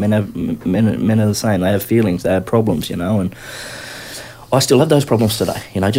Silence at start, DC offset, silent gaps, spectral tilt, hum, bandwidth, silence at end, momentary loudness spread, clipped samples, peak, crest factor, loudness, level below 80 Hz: 0 s; under 0.1%; none; -6 dB/octave; none; 16 kHz; 0 s; 15 LU; under 0.1%; 0 dBFS; 16 dB; -16 LUFS; -44 dBFS